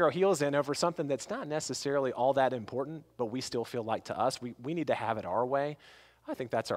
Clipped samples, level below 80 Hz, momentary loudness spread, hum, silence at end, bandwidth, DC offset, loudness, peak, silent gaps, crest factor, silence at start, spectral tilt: under 0.1%; -70 dBFS; 10 LU; none; 0 s; 16 kHz; under 0.1%; -32 LUFS; -14 dBFS; none; 18 dB; 0 s; -5 dB/octave